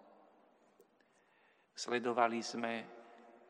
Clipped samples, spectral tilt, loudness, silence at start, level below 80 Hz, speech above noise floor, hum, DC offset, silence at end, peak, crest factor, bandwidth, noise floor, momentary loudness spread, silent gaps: under 0.1%; -3.5 dB/octave; -37 LUFS; 1.75 s; under -90 dBFS; 35 dB; none; under 0.1%; 0.15 s; -16 dBFS; 26 dB; 11 kHz; -72 dBFS; 22 LU; none